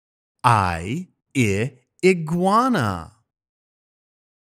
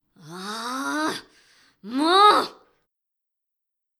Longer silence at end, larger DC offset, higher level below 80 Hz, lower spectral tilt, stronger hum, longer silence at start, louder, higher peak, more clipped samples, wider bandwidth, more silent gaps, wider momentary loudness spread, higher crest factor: about the same, 1.4 s vs 1.45 s; neither; first, -52 dBFS vs -76 dBFS; first, -6 dB/octave vs -2.5 dB/octave; neither; first, 0.45 s vs 0.25 s; about the same, -21 LUFS vs -21 LUFS; first, 0 dBFS vs -4 dBFS; neither; about the same, 15.5 kHz vs 15 kHz; neither; second, 12 LU vs 20 LU; about the same, 22 dB vs 20 dB